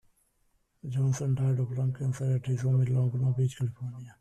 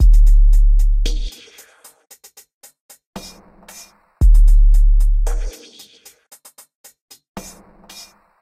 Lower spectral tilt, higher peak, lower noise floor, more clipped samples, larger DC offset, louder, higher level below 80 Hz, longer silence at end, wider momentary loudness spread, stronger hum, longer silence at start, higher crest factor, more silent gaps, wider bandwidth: first, -8 dB/octave vs -5.5 dB/octave; second, -18 dBFS vs -4 dBFS; first, -71 dBFS vs -46 dBFS; neither; neither; second, -29 LUFS vs -17 LUFS; second, -62 dBFS vs -14 dBFS; second, 0.1 s vs 1 s; second, 9 LU vs 26 LU; neither; first, 0.85 s vs 0 s; about the same, 10 dB vs 12 dB; second, none vs 2.54-2.61 s, 2.80-2.89 s, 3.06-3.13 s, 6.75-6.84 s, 7.01-7.08 s, 7.29-7.35 s; about the same, 9.4 kHz vs 9.4 kHz